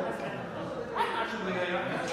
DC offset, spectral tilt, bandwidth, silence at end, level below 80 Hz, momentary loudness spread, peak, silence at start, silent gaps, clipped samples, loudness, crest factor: under 0.1%; -5 dB/octave; 14.5 kHz; 0 s; -62 dBFS; 6 LU; -16 dBFS; 0 s; none; under 0.1%; -33 LUFS; 16 dB